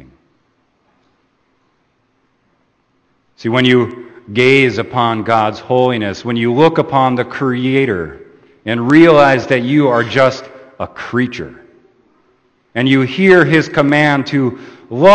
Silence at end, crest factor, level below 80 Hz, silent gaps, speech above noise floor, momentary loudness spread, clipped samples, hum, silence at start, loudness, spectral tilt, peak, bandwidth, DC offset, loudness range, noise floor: 0 s; 14 dB; -52 dBFS; none; 48 dB; 16 LU; 0.2%; none; 3.4 s; -12 LUFS; -6.5 dB/octave; 0 dBFS; 8.8 kHz; under 0.1%; 6 LU; -60 dBFS